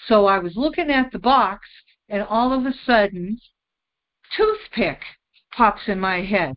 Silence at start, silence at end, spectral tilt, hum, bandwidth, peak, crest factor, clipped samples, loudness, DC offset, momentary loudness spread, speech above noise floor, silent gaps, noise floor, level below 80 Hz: 0 s; 0 s; -10 dB/octave; none; 5.6 kHz; -2 dBFS; 20 dB; under 0.1%; -20 LUFS; under 0.1%; 13 LU; 64 dB; none; -84 dBFS; -48 dBFS